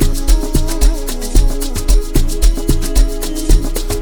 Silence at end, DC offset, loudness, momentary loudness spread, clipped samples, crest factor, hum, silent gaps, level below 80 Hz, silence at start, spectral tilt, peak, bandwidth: 0 s; under 0.1%; -17 LUFS; 4 LU; under 0.1%; 12 dB; none; none; -12 dBFS; 0 s; -5 dB/octave; 0 dBFS; over 20 kHz